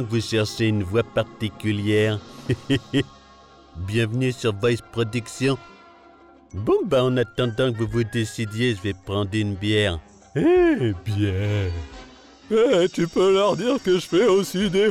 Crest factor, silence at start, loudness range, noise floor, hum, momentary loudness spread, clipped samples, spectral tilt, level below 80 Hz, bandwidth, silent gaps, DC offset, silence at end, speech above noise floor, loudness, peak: 12 dB; 0 s; 4 LU; -50 dBFS; none; 10 LU; under 0.1%; -6 dB/octave; -50 dBFS; 15 kHz; none; under 0.1%; 0 s; 29 dB; -22 LUFS; -10 dBFS